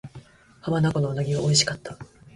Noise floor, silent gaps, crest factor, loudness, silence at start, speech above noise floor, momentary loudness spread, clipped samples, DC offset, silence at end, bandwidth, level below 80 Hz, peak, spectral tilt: -48 dBFS; none; 20 dB; -23 LUFS; 0.05 s; 24 dB; 21 LU; under 0.1%; under 0.1%; 0.3 s; 11.5 kHz; -54 dBFS; -4 dBFS; -4 dB/octave